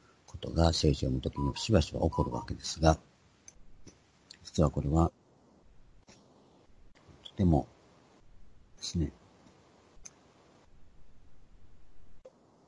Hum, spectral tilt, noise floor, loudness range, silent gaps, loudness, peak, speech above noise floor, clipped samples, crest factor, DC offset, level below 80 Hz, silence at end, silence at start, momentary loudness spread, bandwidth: none; -6 dB/octave; -62 dBFS; 13 LU; none; -31 LUFS; -8 dBFS; 33 dB; under 0.1%; 26 dB; under 0.1%; -46 dBFS; 0.4 s; 0.3 s; 23 LU; 11 kHz